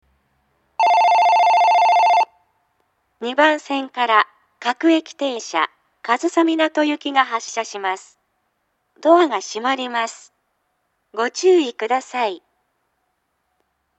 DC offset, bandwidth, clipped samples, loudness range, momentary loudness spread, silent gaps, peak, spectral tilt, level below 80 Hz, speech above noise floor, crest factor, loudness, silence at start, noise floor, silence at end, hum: under 0.1%; 8.4 kHz; under 0.1%; 5 LU; 11 LU; none; 0 dBFS; -1.5 dB/octave; -78 dBFS; 52 dB; 20 dB; -18 LUFS; 0.8 s; -71 dBFS; 1.6 s; none